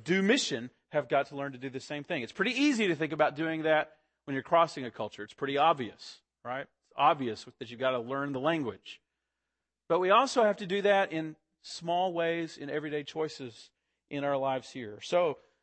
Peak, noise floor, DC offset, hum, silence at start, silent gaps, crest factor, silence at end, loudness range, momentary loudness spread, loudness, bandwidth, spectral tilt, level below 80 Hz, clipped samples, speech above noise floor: -12 dBFS; -87 dBFS; under 0.1%; none; 0 s; none; 20 dB; 0.25 s; 5 LU; 15 LU; -30 LUFS; 8.8 kHz; -4.5 dB/octave; -78 dBFS; under 0.1%; 57 dB